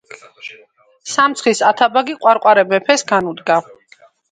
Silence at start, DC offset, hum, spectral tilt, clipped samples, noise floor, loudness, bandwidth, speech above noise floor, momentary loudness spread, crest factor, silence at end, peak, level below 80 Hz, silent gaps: 0.1 s; under 0.1%; none; -3 dB/octave; under 0.1%; -49 dBFS; -14 LUFS; 9.4 kHz; 35 dB; 21 LU; 16 dB; 0.7 s; 0 dBFS; -64 dBFS; none